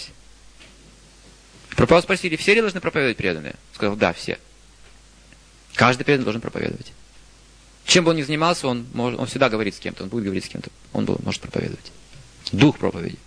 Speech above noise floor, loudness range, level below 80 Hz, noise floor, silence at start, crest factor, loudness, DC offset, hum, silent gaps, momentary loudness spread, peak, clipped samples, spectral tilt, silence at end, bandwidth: 28 dB; 5 LU; -48 dBFS; -49 dBFS; 0 s; 22 dB; -21 LUFS; under 0.1%; none; none; 15 LU; 0 dBFS; under 0.1%; -4.5 dB/octave; 0.1 s; 10.5 kHz